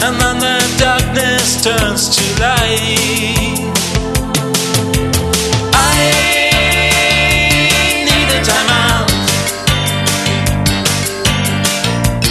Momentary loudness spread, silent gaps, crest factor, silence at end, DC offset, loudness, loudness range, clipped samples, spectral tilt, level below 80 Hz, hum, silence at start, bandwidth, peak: 5 LU; none; 12 dB; 0 s; under 0.1%; -11 LUFS; 3 LU; under 0.1%; -3 dB/octave; -24 dBFS; none; 0 s; 13.5 kHz; 0 dBFS